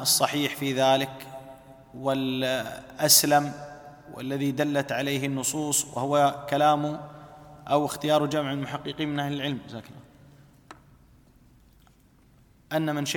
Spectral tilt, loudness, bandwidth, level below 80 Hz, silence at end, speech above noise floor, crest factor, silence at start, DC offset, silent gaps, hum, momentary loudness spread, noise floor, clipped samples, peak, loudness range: -3.5 dB/octave; -25 LUFS; 19 kHz; -62 dBFS; 0 s; 33 dB; 26 dB; 0 s; under 0.1%; none; none; 20 LU; -58 dBFS; under 0.1%; -2 dBFS; 11 LU